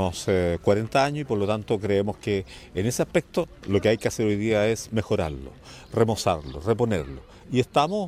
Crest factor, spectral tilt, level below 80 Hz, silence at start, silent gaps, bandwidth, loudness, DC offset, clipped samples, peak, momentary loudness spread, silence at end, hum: 20 dB; -5.5 dB/octave; -46 dBFS; 0 s; none; 15.5 kHz; -25 LUFS; under 0.1%; under 0.1%; -4 dBFS; 8 LU; 0 s; none